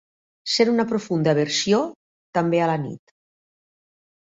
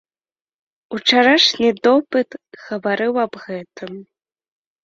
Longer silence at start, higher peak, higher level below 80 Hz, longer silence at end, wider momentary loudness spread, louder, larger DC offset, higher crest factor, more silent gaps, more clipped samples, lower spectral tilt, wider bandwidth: second, 0.45 s vs 0.9 s; second, -6 dBFS vs 0 dBFS; about the same, -64 dBFS vs -64 dBFS; first, 1.35 s vs 0.8 s; second, 13 LU vs 21 LU; second, -22 LUFS vs -16 LUFS; neither; about the same, 18 dB vs 18 dB; first, 1.95-2.33 s vs none; neither; first, -5 dB/octave vs -3.5 dB/octave; about the same, 8.2 kHz vs 7.8 kHz